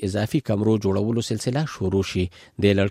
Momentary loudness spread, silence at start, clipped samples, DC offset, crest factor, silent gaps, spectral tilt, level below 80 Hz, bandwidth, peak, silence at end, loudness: 5 LU; 0 s; under 0.1%; under 0.1%; 18 dB; none; -6.5 dB/octave; -50 dBFS; 15 kHz; -4 dBFS; 0 s; -23 LUFS